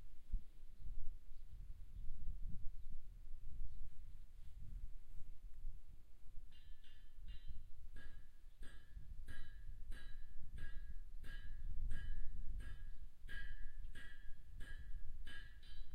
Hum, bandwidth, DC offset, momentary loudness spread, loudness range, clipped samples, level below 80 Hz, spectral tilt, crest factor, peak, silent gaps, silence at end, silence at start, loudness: none; 4.1 kHz; under 0.1%; 10 LU; 7 LU; under 0.1%; -48 dBFS; -5 dB/octave; 14 dB; -26 dBFS; none; 0 s; 0 s; -58 LUFS